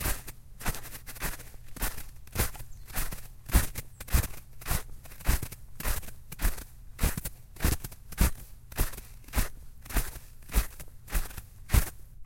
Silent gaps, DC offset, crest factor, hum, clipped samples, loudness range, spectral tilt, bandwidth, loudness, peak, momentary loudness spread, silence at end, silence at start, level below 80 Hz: none; under 0.1%; 24 dB; none; under 0.1%; 3 LU; -4 dB/octave; 17 kHz; -34 LUFS; -8 dBFS; 16 LU; 0 s; 0 s; -34 dBFS